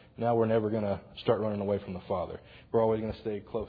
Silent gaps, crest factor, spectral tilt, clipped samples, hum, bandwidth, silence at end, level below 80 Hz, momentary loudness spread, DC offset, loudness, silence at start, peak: none; 18 dB; -6.5 dB/octave; under 0.1%; none; 5 kHz; 0 s; -56 dBFS; 8 LU; under 0.1%; -31 LUFS; 0.2 s; -12 dBFS